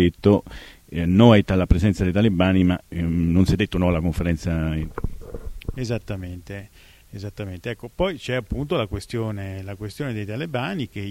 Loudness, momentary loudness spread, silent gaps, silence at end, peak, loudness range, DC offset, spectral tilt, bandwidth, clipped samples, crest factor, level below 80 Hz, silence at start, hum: -22 LUFS; 17 LU; none; 0 s; -2 dBFS; 11 LU; under 0.1%; -7.5 dB/octave; 15.5 kHz; under 0.1%; 20 dB; -34 dBFS; 0 s; none